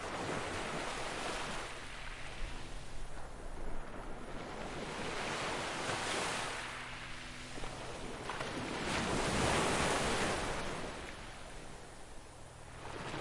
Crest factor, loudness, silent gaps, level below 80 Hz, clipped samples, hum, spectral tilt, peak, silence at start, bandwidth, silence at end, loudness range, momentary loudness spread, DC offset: 18 dB; -39 LUFS; none; -50 dBFS; under 0.1%; none; -3.5 dB/octave; -20 dBFS; 0 s; 11.5 kHz; 0 s; 9 LU; 16 LU; under 0.1%